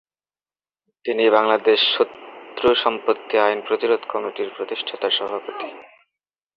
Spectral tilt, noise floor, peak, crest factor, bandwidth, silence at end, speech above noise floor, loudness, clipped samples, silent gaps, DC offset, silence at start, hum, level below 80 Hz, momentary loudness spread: -5.5 dB/octave; under -90 dBFS; -2 dBFS; 20 dB; 5.8 kHz; 0.75 s; over 70 dB; -20 LUFS; under 0.1%; none; under 0.1%; 1.05 s; none; -64 dBFS; 15 LU